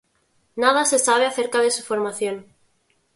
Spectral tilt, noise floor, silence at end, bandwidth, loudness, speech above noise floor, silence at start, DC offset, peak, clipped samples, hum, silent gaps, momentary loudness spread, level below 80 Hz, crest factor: -1 dB/octave; -66 dBFS; 0.75 s; 11.5 kHz; -20 LUFS; 45 dB; 0.55 s; under 0.1%; -2 dBFS; under 0.1%; none; none; 11 LU; -70 dBFS; 20 dB